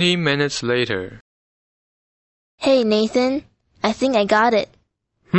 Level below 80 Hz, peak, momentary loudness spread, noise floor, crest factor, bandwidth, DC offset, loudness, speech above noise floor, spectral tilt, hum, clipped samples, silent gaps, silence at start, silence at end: -56 dBFS; -4 dBFS; 10 LU; -66 dBFS; 18 dB; 8.4 kHz; under 0.1%; -19 LUFS; 48 dB; -5 dB/octave; none; under 0.1%; 1.21-2.58 s; 0 s; 0 s